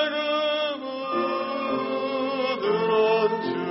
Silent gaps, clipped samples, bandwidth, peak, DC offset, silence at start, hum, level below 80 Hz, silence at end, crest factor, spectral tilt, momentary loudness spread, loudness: none; under 0.1%; 6 kHz; -10 dBFS; under 0.1%; 0 s; none; -70 dBFS; 0 s; 14 dB; -2 dB/octave; 6 LU; -25 LUFS